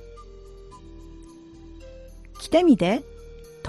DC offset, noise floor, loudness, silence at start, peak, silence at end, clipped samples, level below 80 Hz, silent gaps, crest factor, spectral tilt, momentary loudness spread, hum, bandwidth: under 0.1%; -45 dBFS; -21 LUFS; 0.2 s; -6 dBFS; 0 s; under 0.1%; -46 dBFS; none; 20 dB; -6 dB/octave; 28 LU; none; 12.5 kHz